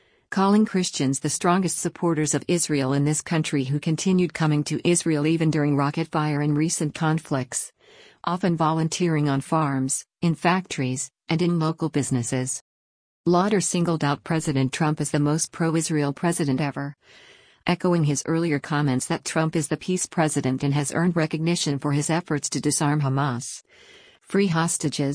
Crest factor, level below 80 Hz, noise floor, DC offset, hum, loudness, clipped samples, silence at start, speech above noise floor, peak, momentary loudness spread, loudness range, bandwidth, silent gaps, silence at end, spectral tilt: 16 dB; -60 dBFS; -48 dBFS; under 0.1%; none; -23 LUFS; under 0.1%; 0.3 s; 25 dB; -8 dBFS; 5 LU; 2 LU; 10.5 kHz; 12.61-13.24 s; 0 s; -5 dB/octave